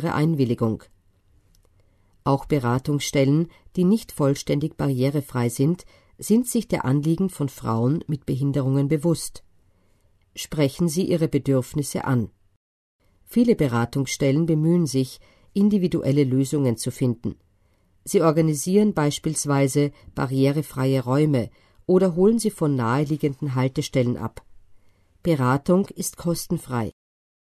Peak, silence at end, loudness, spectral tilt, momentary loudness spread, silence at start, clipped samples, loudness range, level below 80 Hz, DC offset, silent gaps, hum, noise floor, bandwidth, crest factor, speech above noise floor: -6 dBFS; 0.6 s; -23 LUFS; -6.5 dB/octave; 9 LU; 0 s; under 0.1%; 3 LU; -52 dBFS; under 0.1%; 12.56-12.99 s; none; -62 dBFS; 13.5 kHz; 18 dB; 40 dB